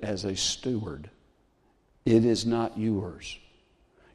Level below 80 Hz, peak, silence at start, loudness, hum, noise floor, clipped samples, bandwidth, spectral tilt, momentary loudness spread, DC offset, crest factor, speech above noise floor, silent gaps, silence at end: -54 dBFS; -10 dBFS; 0 s; -27 LUFS; none; -66 dBFS; under 0.1%; 12 kHz; -5 dB/octave; 18 LU; under 0.1%; 20 dB; 39 dB; none; 0.75 s